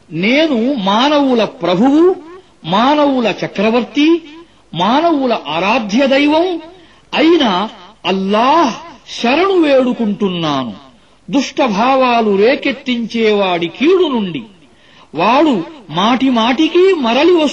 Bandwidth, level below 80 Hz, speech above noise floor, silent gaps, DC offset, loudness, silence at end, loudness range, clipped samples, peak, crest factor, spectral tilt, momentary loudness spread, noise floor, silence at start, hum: 8.4 kHz; -54 dBFS; 32 dB; none; 0.2%; -13 LUFS; 0 s; 2 LU; under 0.1%; 0 dBFS; 12 dB; -5.5 dB/octave; 8 LU; -45 dBFS; 0.1 s; none